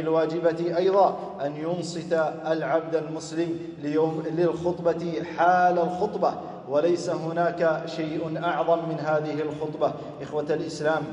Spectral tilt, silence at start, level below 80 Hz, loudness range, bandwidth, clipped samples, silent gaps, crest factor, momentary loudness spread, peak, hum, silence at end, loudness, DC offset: -6.5 dB/octave; 0 s; -66 dBFS; 3 LU; 10.5 kHz; under 0.1%; none; 18 dB; 9 LU; -8 dBFS; none; 0 s; -26 LUFS; under 0.1%